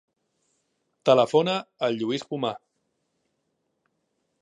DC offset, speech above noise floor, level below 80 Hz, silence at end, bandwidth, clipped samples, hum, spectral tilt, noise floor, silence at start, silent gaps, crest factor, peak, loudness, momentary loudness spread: under 0.1%; 53 dB; -78 dBFS; 1.85 s; 11 kHz; under 0.1%; none; -5.5 dB/octave; -76 dBFS; 1.05 s; none; 24 dB; -4 dBFS; -24 LUFS; 11 LU